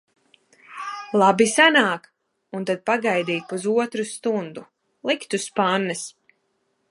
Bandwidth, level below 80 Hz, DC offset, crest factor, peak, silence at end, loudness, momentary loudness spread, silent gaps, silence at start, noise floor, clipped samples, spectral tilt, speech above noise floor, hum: 11.5 kHz; -74 dBFS; under 0.1%; 22 dB; -2 dBFS; 0.8 s; -21 LUFS; 19 LU; none; 0.7 s; -71 dBFS; under 0.1%; -3.5 dB/octave; 50 dB; none